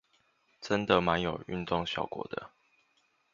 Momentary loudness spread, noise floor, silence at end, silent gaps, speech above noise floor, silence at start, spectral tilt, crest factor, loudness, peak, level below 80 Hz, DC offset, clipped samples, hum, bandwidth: 15 LU; -72 dBFS; 0.85 s; none; 41 dB; 0.6 s; -5.5 dB/octave; 26 dB; -31 LUFS; -8 dBFS; -56 dBFS; under 0.1%; under 0.1%; none; 7.6 kHz